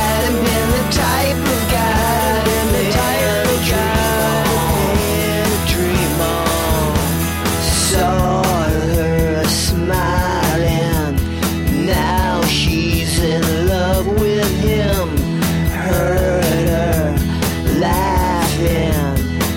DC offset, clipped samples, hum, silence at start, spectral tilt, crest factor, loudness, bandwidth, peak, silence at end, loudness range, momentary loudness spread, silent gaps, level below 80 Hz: under 0.1%; under 0.1%; none; 0 s; -5 dB/octave; 12 dB; -16 LUFS; 17 kHz; -4 dBFS; 0 s; 1 LU; 3 LU; none; -24 dBFS